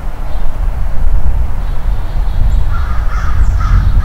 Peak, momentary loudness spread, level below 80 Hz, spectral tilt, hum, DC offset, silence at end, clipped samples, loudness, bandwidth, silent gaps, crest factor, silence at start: 0 dBFS; 7 LU; -12 dBFS; -7 dB/octave; none; under 0.1%; 0 s; 1%; -17 LUFS; 6.2 kHz; none; 8 dB; 0 s